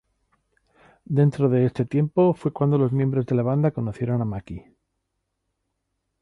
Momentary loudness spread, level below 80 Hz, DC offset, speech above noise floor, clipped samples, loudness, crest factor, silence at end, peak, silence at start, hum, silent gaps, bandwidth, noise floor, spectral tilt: 9 LU; -54 dBFS; under 0.1%; 56 dB; under 0.1%; -22 LUFS; 16 dB; 1.6 s; -8 dBFS; 1.1 s; none; none; 5.8 kHz; -78 dBFS; -10.5 dB/octave